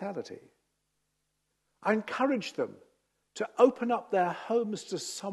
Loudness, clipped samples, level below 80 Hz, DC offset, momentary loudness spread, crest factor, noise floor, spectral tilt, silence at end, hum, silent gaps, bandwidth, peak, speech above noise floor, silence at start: -30 LUFS; under 0.1%; -82 dBFS; under 0.1%; 15 LU; 22 dB; -80 dBFS; -4.5 dB/octave; 0 s; 50 Hz at -80 dBFS; none; 12.5 kHz; -10 dBFS; 50 dB; 0 s